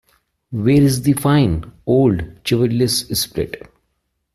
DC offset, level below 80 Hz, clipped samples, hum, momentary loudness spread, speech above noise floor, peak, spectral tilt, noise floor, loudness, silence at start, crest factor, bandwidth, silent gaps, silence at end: under 0.1%; -40 dBFS; under 0.1%; none; 11 LU; 54 dB; -2 dBFS; -5.5 dB/octave; -70 dBFS; -17 LUFS; 0.5 s; 14 dB; 15 kHz; none; 0.75 s